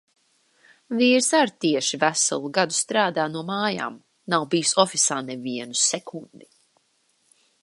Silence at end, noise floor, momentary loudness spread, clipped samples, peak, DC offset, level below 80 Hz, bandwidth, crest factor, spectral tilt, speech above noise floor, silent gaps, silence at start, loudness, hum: 1.25 s; -67 dBFS; 12 LU; under 0.1%; -4 dBFS; under 0.1%; -78 dBFS; 11.5 kHz; 22 dB; -2.5 dB/octave; 44 dB; none; 0.9 s; -22 LUFS; none